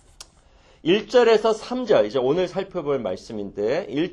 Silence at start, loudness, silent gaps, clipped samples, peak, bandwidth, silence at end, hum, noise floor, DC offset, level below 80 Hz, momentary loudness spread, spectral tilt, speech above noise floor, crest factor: 0.85 s; -22 LUFS; none; under 0.1%; -6 dBFS; 10.5 kHz; 0 s; none; -54 dBFS; under 0.1%; -54 dBFS; 12 LU; -5.5 dB/octave; 33 dB; 16 dB